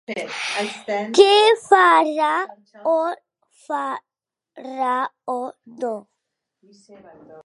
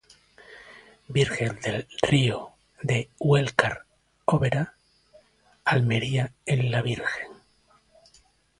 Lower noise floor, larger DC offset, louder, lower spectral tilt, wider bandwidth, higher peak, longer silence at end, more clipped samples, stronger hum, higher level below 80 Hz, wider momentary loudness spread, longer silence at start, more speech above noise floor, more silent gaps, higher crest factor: first, -79 dBFS vs -62 dBFS; neither; first, -19 LUFS vs -26 LUFS; second, -2.5 dB/octave vs -6 dB/octave; about the same, 11.5 kHz vs 11.5 kHz; about the same, 0 dBFS vs 0 dBFS; second, 0.05 s vs 1.25 s; neither; neither; second, -74 dBFS vs -56 dBFS; first, 20 LU vs 14 LU; second, 0.1 s vs 0.5 s; first, 59 dB vs 38 dB; neither; second, 20 dB vs 26 dB